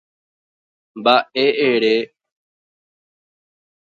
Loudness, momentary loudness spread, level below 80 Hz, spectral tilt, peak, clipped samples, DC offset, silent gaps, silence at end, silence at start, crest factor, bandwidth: -17 LUFS; 6 LU; -74 dBFS; -5.5 dB/octave; 0 dBFS; under 0.1%; under 0.1%; none; 1.75 s; 0.95 s; 22 dB; 7.2 kHz